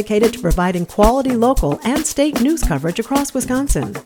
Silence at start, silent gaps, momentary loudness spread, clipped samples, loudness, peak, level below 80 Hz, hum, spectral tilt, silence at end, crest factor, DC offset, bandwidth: 0 s; none; 5 LU; under 0.1%; -17 LUFS; 0 dBFS; -26 dBFS; none; -5 dB/octave; 0.05 s; 16 dB; under 0.1%; 19.5 kHz